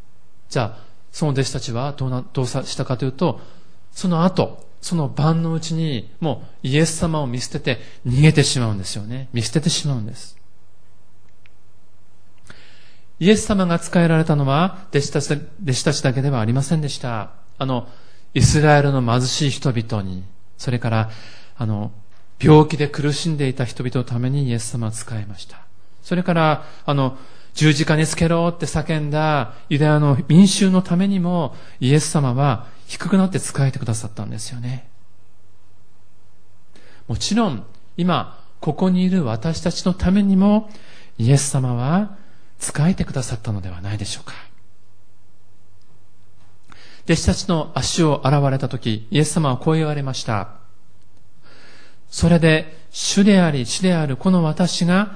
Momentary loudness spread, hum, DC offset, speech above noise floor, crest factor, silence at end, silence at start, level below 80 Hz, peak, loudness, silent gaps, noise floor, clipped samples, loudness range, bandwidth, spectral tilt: 13 LU; none; 3%; 39 dB; 20 dB; 0 s; 0.5 s; -42 dBFS; 0 dBFS; -19 LUFS; none; -58 dBFS; under 0.1%; 9 LU; 10.5 kHz; -5.5 dB/octave